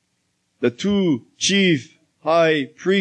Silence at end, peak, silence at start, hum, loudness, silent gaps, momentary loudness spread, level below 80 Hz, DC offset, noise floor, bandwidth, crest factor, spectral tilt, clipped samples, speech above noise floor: 0 s; -6 dBFS; 0.6 s; none; -19 LUFS; none; 8 LU; -60 dBFS; under 0.1%; -70 dBFS; 9.4 kHz; 14 dB; -4.5 dB/octave; under 0.1%; 51 dB